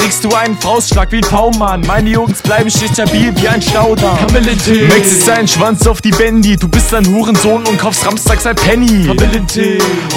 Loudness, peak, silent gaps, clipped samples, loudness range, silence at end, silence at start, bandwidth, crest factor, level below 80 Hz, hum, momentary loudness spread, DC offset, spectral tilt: -10 LUFS; 0 dBFS; none; 0.7%; 2 LU; 0 s; 0 s; 18 kHz; 10 dB; -18 dBFS; none; 4 LU; under 0.1%; -4.5 dB/octave